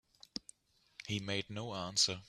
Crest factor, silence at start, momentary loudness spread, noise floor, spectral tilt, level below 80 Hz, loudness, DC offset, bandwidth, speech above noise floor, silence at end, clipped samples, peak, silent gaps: 22 dB; 1 s; 17 LU; -63 dBFS; -2.5 dB/octave; -70 dBFS; -38 LUFS; under 0.1%; 14 kHz; 26 dB; 0.05 s; under 0.1%; -18 dBFS; none